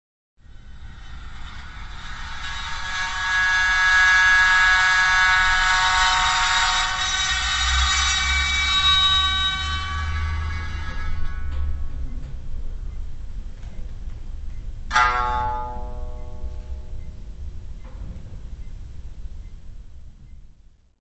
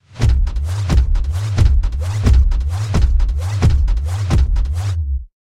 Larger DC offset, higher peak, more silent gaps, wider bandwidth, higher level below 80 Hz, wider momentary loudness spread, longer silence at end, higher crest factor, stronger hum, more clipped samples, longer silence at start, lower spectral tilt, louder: neither; about the same, -4 dBFS vs -2 dBFS; neither; second, 8.4 kHz vs 11 kHz; second, -30 dBFS vs -16 dBFS; first, 24 LU vs 6 LU; first, 0.5 s vs 0.25 s; about the same, 18 dB vs 14 dB; neither; neither; first, 0.45 s vs 0.15 s; second, -1 dB/octave vs -6.5 dB/octave; about the same, -18 LUFS vs -18 LUFS